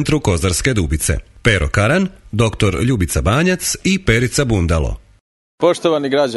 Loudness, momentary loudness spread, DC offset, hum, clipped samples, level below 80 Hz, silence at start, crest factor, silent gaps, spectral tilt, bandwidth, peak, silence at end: -16 LUFS; 4 LU; under 0.1%; none; under 0.1%; -28 dBFS; 0 s; 16 dB; 5.20-5.58 s; -5 dB/octave; 12 kHz; 0 dBFS; 0 s